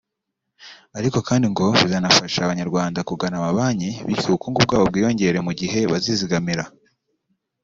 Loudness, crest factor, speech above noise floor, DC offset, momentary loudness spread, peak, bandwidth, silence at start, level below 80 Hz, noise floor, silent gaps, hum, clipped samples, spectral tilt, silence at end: -20 LUFS; 20 dB; 60 dB; under 0.1%; 9 LU; 0 dBFS; 7.8 kHz; 0.6 s; -52 dBFS; -80 dBFS; none; none; under 0.1%; -4.5 dB/octave; 0.95 s